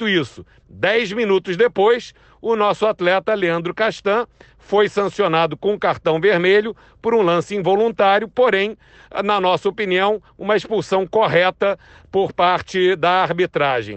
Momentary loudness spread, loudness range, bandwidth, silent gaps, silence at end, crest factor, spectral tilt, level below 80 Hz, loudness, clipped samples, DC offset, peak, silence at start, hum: 6 LU; 2 LU; 8.6 kHz; none; 0 s; 12 dB; -5.5 dB/octave; -54 dBFS; -18 LUFS; under 0.1%; under 0.1%; -6 dBFS; 0 s; none